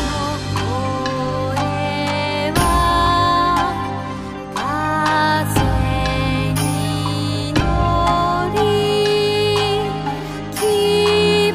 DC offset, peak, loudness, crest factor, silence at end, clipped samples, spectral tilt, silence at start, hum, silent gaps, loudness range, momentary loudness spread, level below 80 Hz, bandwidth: under 0.1%; -2 dBFS; -18 LUFS; 16 dB; 0 s; under 0.1%; -5 dB/octave; 0 s; none; none; 1 LU; 8 LU; -30 dBFS; 15.5 kHz